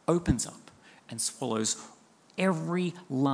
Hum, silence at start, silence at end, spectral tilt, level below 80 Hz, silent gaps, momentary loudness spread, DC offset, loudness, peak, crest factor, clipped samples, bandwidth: none; 0.1 s; 0 s; -4.5 dB/octave; -50 dBFS; none; 13 LU; under 0.1%; -31 LUFS; -10 dBFS; 20 dB; under 0.1%; 10.5 kHz